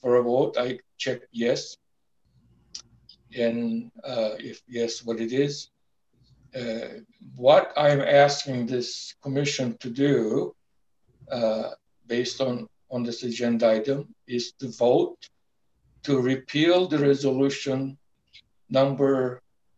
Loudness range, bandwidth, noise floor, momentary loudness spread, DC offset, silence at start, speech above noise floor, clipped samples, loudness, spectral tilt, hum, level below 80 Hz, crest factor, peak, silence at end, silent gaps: 8 LU; 8.2 kHz; -76 dBFS; 15 LU; under 0.1%; 0.05 s; 52 dB; under 0.1%; -25 LUFS; -5.5 dB/octave; none; -70 dBFS; 22 dB; -4 dBFS; 0.4 s; none